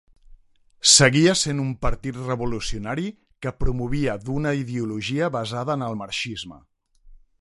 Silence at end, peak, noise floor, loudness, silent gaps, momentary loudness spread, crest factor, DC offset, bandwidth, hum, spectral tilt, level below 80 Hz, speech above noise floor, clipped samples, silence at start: 0.25 s; -2 dBFS; -53 dBFS; -22 LUFS; none; 16 LU; 22 dB; under 0.1%; 11.5 kHz; none; -3.5 dB/octave; -38 dBFS; 31 dB; under 0.1%; 0.3 s